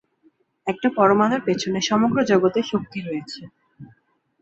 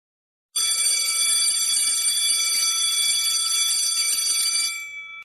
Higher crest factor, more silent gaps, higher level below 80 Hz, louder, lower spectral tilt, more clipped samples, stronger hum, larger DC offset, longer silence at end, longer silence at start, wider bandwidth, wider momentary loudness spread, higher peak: about the same, 18 dB vs 14 dB; neither; first, -62 dBFS vs -72 dBFS; about the same, -21 LUFS vs -19 LUFS; first, -5 dB/octave vs 5 dB/octave; neither; neither; neither; first, 0.55 s vs 0 s; about the same, 0.65 s vs 0.55 s; second, 8 kHz vs 13.5 kHz; first, 14 LU vs 5 LU; first, -4 dBFS vs -8 dBFS